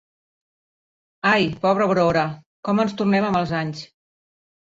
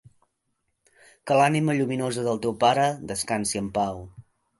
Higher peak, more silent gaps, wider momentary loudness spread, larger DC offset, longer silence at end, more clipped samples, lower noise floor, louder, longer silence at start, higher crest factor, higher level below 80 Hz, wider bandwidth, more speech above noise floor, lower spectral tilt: first, -4 dBFS vs -8 dBFS; first, 2.46-2.63 s vs none; about the same, 10 LU vs 9 LU; neither; first, 0.9 s vs 0.4 s; neither; first, under -90 dBFS vs -76 dBFS; first, -21 LUFS vs -24 LUFS; about the same, 1.25 s vs 1.25 s; about the same, 18 dB vs 18 dB; about the same, -56 dBFS vs -58 dBFS; second, 7.6 kHz vs 12 kHz; first, over 70 dB vs 52 dB; first, -6.5 dB/octave vs -5 dB/octave